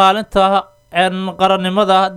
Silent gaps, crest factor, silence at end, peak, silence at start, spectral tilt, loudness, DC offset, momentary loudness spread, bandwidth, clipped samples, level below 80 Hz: none; 14 dB; 0 s; 0 dBFS; 0 s; -5 dB/octave; -15 LUFS; under 0.1%; 5 LU; 13.5 kHz; under 0.1%; -44 dBFS